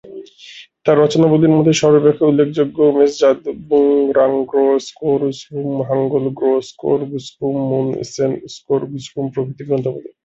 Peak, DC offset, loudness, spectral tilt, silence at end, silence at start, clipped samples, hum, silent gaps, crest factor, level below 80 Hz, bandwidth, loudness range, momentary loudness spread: 0 dBFS; under 0.1%; -16 LUFS; -6.5 dB/octave; 0.15 s; 0.05 s; under 0.1%; none; none; 14 dB; -56 dBFS; 8 kHz; 7 LU; 12 LU